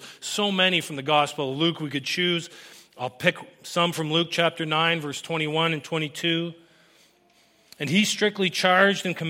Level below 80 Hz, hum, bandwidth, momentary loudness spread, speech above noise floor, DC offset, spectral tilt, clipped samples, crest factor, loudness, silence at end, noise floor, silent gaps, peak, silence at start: -74 dBFS; none; 16 kHz; 10 LU; 36 dB; under 0.1%; -4 dB/octave; under 0.1%; 22 dB; -23 LUFS; 0 s; -61 dBFS; none; -4 dBFS; 0 s